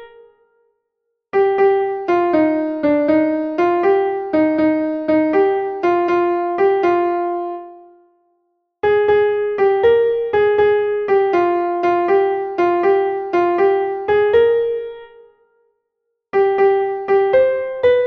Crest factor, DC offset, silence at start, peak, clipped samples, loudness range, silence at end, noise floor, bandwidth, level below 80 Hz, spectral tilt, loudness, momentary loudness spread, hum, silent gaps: 14 dB; under 0.1%; 0 s; -4 dBFS; under 0.1%; 3 LU; 0 s; -75 dBFS; 6.2 kHz; -54 dBFS; -7.5 dB/octave; -16 LUFS; 5 LU; none; none